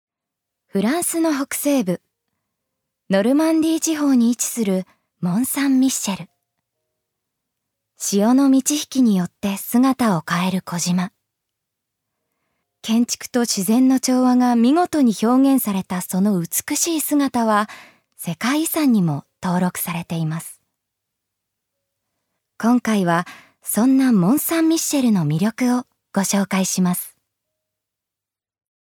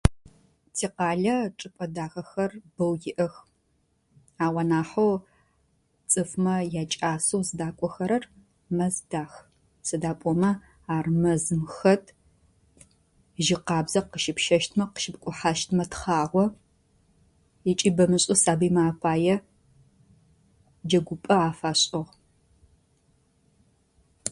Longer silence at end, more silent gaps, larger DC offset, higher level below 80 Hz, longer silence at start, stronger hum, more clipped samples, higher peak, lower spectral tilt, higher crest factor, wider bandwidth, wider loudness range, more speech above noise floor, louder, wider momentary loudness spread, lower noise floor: first, 1.8 s vs 0 s; neither; neither; second, -66 dBFS vs -46 dBFS; first, 0.75 s vs 0.05 s; neither; neither; about the same, -4 dBFS vs -4 dBFS; about the same, -5 dB/octave vs -4.5 dB/octave; second, 16 dB vs 24 dB; first, 19.5 kHz vs 11.5 kHz; about the same, 7 LU vs 5 LU; first, 70 dB vs 45 dB; first, -19 LUFS vs -26 LUFS; about the same, 10 LU vs 11 LU; first, -88 dBFS vs -70 dBFS